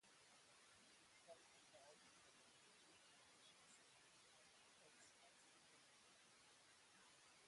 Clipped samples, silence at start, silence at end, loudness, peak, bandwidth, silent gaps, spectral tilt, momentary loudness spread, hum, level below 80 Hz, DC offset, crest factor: under 0.1%; 0 s; 0 s; -69 LUFS; -52 dBFS; 11.5 kHz; none; -1 dB/octave; 2 LU; none; under -90 dBFS; under 0.1%; 20 dB